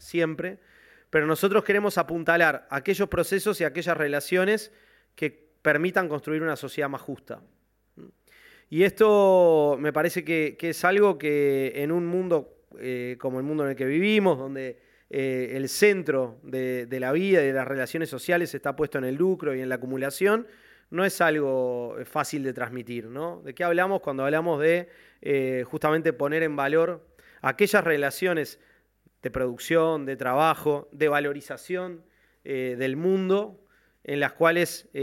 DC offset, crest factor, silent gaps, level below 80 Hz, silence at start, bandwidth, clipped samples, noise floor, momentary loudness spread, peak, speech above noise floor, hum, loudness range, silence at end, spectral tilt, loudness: under 0.1%; 20 dB; none; -62 dBFS; 0.05 s; 17 kHz; under 0.1%; -65 dBFS; 12 LU; -6 dBFS; 40 dB; none; 5 LU; 0 s; -5.5 dB/octave; -25 LUFS